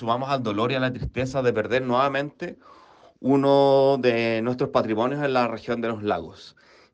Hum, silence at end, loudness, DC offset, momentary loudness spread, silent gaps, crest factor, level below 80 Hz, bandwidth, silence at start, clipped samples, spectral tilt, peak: none; 0.45 s; -23 LUFS; under 0.1%; 11 LU; none; 16 dB; -50 dBFS; 8.4 kHz; 0 s; under 0.1%; -7 dB/octave; -6 dBFS